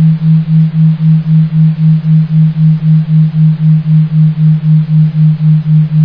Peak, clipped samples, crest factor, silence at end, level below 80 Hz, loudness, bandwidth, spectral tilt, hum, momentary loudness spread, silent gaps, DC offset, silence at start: 0 dBFS; under 0.1%; 6 dB; 0 s; -42 dBFS; -9 LUFS; 3.9 kHz; -12 dB/octave; none; 2 LU; none; under 0.1%; 0 s